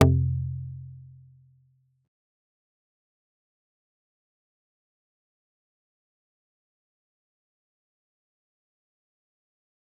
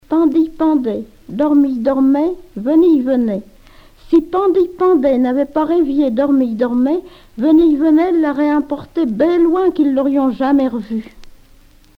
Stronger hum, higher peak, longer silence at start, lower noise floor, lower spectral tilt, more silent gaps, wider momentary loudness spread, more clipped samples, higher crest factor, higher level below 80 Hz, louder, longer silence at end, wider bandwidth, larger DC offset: neither; about the same, -2 dBFS vs -2 dBFS; about the same, 0 s vs 0.1 s; first, -66 dBFS vs -46 dBFS; about the same, -7.5 dB/octave vs -8 dB/octave; neither; first, 25 LU vs 9 LU; neither; first, 32 dB vs 12 dB; second, -54 dBFS vs -44 dBFS; second, -28 LUFS vs -15 LUFS; first, 8.9 s vs 0.7 s; second, 0.7 kHz vs 5.6 kHz; neither